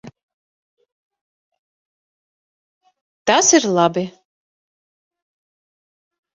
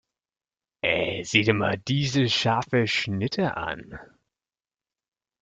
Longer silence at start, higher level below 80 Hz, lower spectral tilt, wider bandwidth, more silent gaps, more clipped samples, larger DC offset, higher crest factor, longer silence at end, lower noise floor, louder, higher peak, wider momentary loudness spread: second, 0.05 s vs 0.85 s; second, -66 dBFS vs -58 dBFS; second, -2.5 dB/octave vs -5 dB/octave; about the same, 8.2 kHz vs 9 kHz; first, 0.23-0.77 s, 0.92-1.10 s, 1.21-1.52 s, 1.59-2.81 s, 3.01-3.25 s vs none; neither; neither; about the same, 22 dB vs 24 dB; first, 2.3 s vs 1.35 s; about the same, under -90 dBFS vs under -90 dBFS; first, -15 LUFS vs -24 LUFS; about the same, -2 dBFS vs -4 dBFS; about the same, 13 LU vs 11 LU